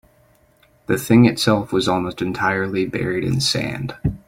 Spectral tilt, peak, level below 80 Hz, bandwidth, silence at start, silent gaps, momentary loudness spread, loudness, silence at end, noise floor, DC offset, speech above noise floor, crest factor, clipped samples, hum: -5.5 dB/octave; -2 dBFS; -44 dBFS; 16.5 kHz; 0.9 s; none; 11 LU; -19 LUFS; 0.1 s; -56 dBFS; under 0.1%; 38 dB; 18 dB; under 0.1%; none